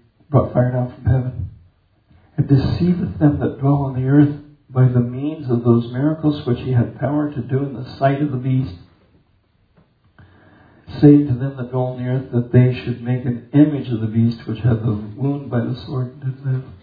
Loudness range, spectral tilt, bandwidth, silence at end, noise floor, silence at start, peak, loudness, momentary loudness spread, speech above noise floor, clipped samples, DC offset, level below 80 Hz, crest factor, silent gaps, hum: 4 LU; -11.5 dB/octave; 5 kHz; 0.05 s; -59 dBFS; 0.3 s; 0 dBFS; -19 LUFS; 10 LU; 42 dB; under 0.1%; under 0.1%; -44 dBFS; 18 dB; none; none